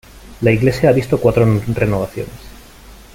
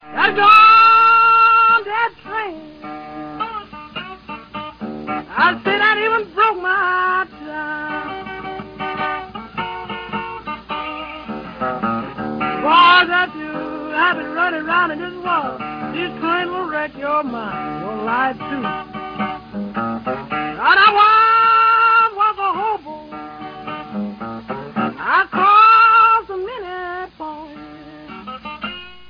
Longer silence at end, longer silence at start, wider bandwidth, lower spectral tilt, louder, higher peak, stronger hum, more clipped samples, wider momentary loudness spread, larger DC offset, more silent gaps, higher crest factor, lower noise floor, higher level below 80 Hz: first, 0.2 s vs 0 s; about the same, 0.15 s vs 0.05 s; first, 16.5 kHz vs 5.2 kHz; first, -7.5 dB/octave vs -6 dB/octave; about the same, -15 LUFS vs -15 LUFS; about the same, -2 dBFS vs 0 dBFS; neither; neither; second, 11 LU vs 21 LU; neither; neither; about the same, 14 dB vs 18 dB; about the same, -40 dBFS vs -37 dBFS; first, -36 dBFS vs -52 dBFS